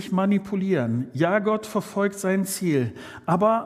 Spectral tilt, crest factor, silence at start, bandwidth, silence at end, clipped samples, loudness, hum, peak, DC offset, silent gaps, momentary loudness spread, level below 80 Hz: -6 dB/octave; 16 dB; 0 s; 15.5 kHz; 0 s; under 0.1%; -24 LUFS; none; -6 dBFS; under 0.1%; none; 5 LU; -64 dBFS